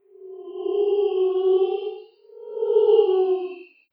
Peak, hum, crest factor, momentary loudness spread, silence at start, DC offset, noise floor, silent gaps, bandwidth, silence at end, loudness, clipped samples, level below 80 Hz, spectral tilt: -6 dBFS; none; 16 dB; 22 LU; 0.2 s; under 0.1%; -44 dBFS; none; 4.3 kHz; 0.3 s; -21 LUFS; under 0.1%; under -90 dBFS; -7.5 dB/octave